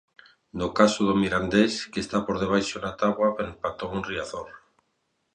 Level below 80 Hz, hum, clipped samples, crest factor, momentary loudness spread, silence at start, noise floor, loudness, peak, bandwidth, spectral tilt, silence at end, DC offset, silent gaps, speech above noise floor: -52 dBFS; none; under 0.1%; 22 dB; 11 LU; 0.55 s; -74 dBFS; -25 LUFS; -4 dBFS; 9.8 kHz; -5 dB/octave; 0.8 s; under 0.1%; none; 49 dB